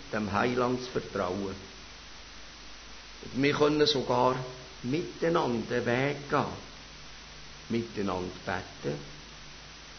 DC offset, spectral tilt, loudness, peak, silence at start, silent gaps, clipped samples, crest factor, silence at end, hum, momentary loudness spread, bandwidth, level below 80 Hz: under 0.1%; -5 dB/octave; -30 LUFS; -12 dBFS; 0 s; none; under 0.1%; 20 dB; 0 s; none; 20 LU; 6.6 kHz; -54 dBFS